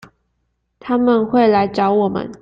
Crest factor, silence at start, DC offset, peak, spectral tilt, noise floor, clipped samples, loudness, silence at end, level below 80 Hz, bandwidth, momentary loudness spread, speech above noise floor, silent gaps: 14 dB; 0.85 s; under 0.1%; -2 dBFS; -8 dB/octave; -69 dBFS; under 0.1%; -16 LUFS; 0.05 s; -54 dBFS; 7.4 kHz; 7 LU; 54 dB; none